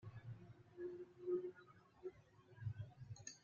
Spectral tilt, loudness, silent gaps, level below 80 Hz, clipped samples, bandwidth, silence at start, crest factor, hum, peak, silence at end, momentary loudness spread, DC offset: -8 dB/octave; -52 LUFS; none; -76 dBFS; under 0.1%; 7.2 kHz; 0 s; 18 dB; none; -34 dBFS; 0 s; 20 LU; under 0.1%